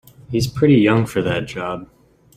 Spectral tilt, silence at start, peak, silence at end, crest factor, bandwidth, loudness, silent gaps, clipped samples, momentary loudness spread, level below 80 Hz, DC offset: -6.5 dB/octave; 0.3 s; -2 dBFS; 0.5 s; 16 dB; 15.5 kHz; -18 LUFS; none; under 0.1%; 13 LU; -48 dBFS; under 0.1%